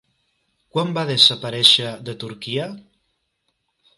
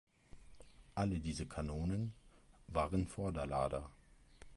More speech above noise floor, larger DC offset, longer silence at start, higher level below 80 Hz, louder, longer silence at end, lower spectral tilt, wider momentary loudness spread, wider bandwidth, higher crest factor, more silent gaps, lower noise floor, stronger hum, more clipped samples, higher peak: first, 52 dB vs 22 dB; neither; first, 0.75 s vs 0.35 s; second, -66 dBFS vs -52 dBFS; first, -17 LUFS vs -41 LUFS; first, 1.15 s vs 0 s; second, -3.5 dB/octave vs -7 dB/octave; first, 18 LU vs 8 LU; first, 13.5 kHz vs 11.5 kHz; about the same, 22 dB vs 20 dB; neither; first, -72 dBFS vs -61 dBFS; neither; neither; first, 0 dBFS vs -22 dBFS